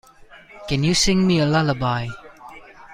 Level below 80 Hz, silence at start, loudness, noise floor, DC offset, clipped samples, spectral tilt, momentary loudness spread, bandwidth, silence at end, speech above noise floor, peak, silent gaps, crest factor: -40 dBFS; 0.35 s; -19 LUFS; -46 dBFS; under 0.1%; under 0.1%; -4.5 dB/octave; 21 LU; 15.5 kHz; 0 s; 27 dB; -6 dBFS; none; 16 dB